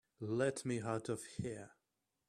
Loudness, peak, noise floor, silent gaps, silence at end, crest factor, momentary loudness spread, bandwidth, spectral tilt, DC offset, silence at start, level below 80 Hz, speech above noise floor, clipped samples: -41 LUFS; -24 dBFS; -87 dBFS; none; 0.6 s; 18 dB; 11 LU; 13.5 kHz; -5.5 dB/octave; under 0.1%; 0.2 s; -74 dBFS; 47 dB; under 0.1%